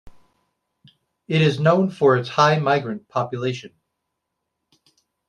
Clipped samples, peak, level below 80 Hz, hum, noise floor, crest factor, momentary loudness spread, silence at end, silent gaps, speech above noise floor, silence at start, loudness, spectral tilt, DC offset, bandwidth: under 0.1%; -2 dBFS; -62 dBFS; none; -79 dBFS; 20 dB; 10 LU; 1.6 s; none; 60 dB; 0.05 s; -20 LUFS; -6.5 dB/octave; under 0.1%; 9.6 kHz